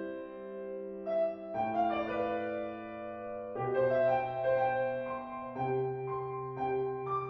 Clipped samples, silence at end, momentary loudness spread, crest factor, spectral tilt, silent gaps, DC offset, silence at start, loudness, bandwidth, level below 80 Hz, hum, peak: under 0.1%; 0 s; 12 LU; 16 dB; -9 dB/octave; none; under 0.1%; 0 s; -34 LUFS; 5.8 kHz; -68 dBFS; none; -18 dBFS